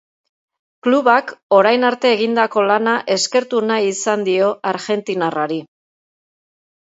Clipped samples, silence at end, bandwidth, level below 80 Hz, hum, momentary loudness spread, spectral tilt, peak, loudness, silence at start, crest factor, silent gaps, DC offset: under 0.1%; 1.25 s; 8 kHz; -72 dBFS; none; 8 LU; -3.5 dB/octave; 0 dBFS; -16 LUFS; 0.85 s; 18 dB; 1.43-1.50 s; under 0.1%